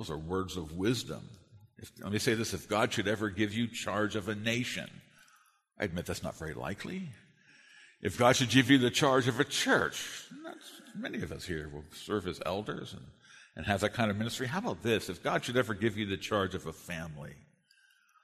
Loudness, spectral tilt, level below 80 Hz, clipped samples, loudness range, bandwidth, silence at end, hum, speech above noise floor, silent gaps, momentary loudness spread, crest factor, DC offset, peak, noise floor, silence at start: -32 LUFS; -4.5 dB/octave; -60 dBFS; under 0.1%; 10 LU; 13.5 kHz; 0.85 s; none; 35 dB; none; 19 LU; 24 dB; under 0.1%; -8 dBFS; -67 dBFS; 0 s